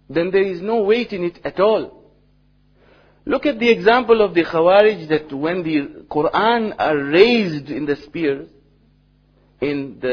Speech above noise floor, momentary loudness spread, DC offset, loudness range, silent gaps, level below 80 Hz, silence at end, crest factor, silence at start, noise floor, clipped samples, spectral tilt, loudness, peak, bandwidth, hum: 39 dB; 11 LU; under 0.1%; 4 LU; none; -52 dBFS; 0 s; 18 dB; 0.1 s; -56 dBFS; under 0.1%; -7 dB/octave; -18 LUFS; 0 dBFS; 5.4 kHz; 50 Hz at -55 dBFS